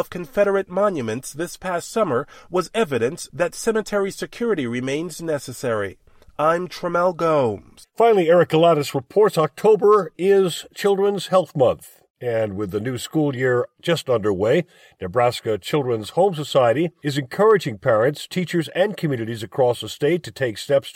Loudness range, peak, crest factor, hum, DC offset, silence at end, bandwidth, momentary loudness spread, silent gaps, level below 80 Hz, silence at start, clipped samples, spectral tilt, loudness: 6 LU; -4 dBFS; 16 dB; none; under 0.1%; 0.05 s; 16.5 kHz; 9 LU; 12.10-12.14 s; -56 dBFS; 0 s; under 0.1%; -5.5 dB/octave; -21 LUFS